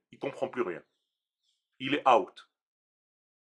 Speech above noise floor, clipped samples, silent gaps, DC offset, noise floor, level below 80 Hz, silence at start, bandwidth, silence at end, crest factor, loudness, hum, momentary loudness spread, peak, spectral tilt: 55 dB; under 0.1%; none; under 0.1%; -84 dBFS; -84 dBFS; 0.2 s; 10.5 kHz; 1.05 s; 26 dB; -30 LUFS; none; 17 LU; -8 dBFS; -5 dB/octave